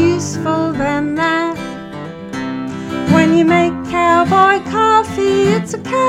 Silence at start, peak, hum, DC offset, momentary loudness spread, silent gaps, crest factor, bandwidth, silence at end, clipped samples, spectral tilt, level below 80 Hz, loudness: 0 s; 0 dBFS; none; under 0.1%; 14 LU; none; 14 dB; 12.5 kHz; 0 s; under 0.1%; -5.5 dB/octave; -44 dBFS; -14 LUFS